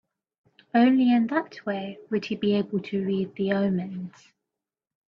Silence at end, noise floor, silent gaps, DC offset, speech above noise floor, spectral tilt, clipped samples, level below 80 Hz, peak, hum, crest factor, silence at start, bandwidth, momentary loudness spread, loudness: 1.05 s; -88 dBFS; none; under 0.1%; 63 dB; -8 dB/octave; under 0.1%; -68 dBFS; -10 dBFS; none; 16 dB; 0.75 s; 6.4 kHz; 12 LU; -25 LUFS